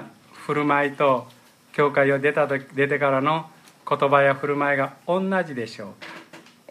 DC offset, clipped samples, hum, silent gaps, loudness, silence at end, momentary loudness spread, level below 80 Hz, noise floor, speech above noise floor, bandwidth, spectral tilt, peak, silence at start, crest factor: under 0.1%; under 0.1%; none; none; -22 LUFS; 0.3 s; 18 LU; -74 dBFS; -47 dBFS; 25 dB; 14 kHz; -6.5 dB/octave; -4 dBFS; 0 s; 18 dB